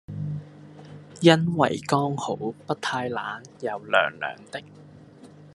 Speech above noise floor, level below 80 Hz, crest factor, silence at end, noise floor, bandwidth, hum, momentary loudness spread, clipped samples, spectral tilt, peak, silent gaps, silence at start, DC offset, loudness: 24 dB; -66 dBFS; 26 dB; 0.05 s; -48 dBFS; 12 kHz; none; 22 LU; under 0.1%; -5.5 dB/octave; 0 dBFS; none; 0.1 s; under 0.1%; -25 LUFS